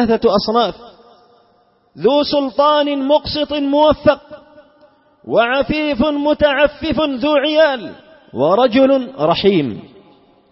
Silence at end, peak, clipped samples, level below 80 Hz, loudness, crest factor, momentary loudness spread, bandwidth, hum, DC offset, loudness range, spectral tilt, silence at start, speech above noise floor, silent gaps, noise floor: 0.65 s; -2 dBFS; under 0.1%; -42 dBFS; -15 LUFS; 14 dB; 7 LU; 5.8 kHz; none; under 0.1%; 2 LU; -8.5 dB/octave; 0 s; 41 dB; none; -56 dBFS